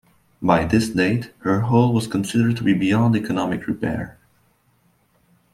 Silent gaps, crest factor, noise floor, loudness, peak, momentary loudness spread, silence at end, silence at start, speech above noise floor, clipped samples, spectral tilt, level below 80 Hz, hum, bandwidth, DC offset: none; 20 dB; -62 dBFS; -20 LUFS; -2 dBFS; 8 LU; 1.45 s; 0.4 s; 42 dB; under 0.1%; -7 dB/octave; -48 dBFS; none; 15 kHz; under 0.1%